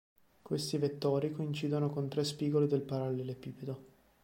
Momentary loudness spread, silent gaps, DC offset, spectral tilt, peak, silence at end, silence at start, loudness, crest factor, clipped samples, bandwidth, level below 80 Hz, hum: 12 LU; none; under 0.1%; -6.5 dB/octave; -18 dBFS; 0.35 s; 0.45 s; -35 LUFS; 16 dB; under 0.1%; 16.5 kHz; -72 dBFS; none